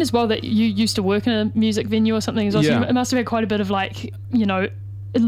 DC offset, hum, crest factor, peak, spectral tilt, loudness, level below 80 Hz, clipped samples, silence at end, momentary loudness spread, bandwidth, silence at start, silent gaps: under 0.1%; none; 14 dB; -4 dBFS; -5.5 dB/octave; -20 LUFS; -50 dBFS; under 0.1%; 0 s; 6 LU; 15 kHz; 0 s; none